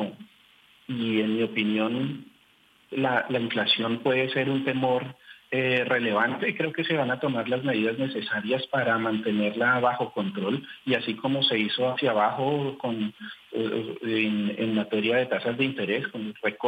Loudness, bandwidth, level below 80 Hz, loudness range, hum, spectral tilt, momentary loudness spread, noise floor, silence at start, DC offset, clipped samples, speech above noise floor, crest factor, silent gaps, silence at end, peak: -26 LUFS; 9 kHz; -74 dBFS; 2 LU; none; -7 dB/octave; 8 LU; -61 dBFS; 0 s; under 0.1%; under 0.1%; 35 dB; 16 dB; none; 0 s; -10 dBFS